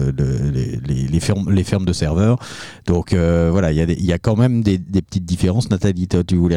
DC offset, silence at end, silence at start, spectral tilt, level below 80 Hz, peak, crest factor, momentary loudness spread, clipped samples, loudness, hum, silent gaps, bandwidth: 0.4%; 0 s; 0 s; -7 dB/octave; -32 dBFS; -2 dBFS; 14 dB; 6 LU; under 0.1%; -18 LUFS; none; none; 12 kHz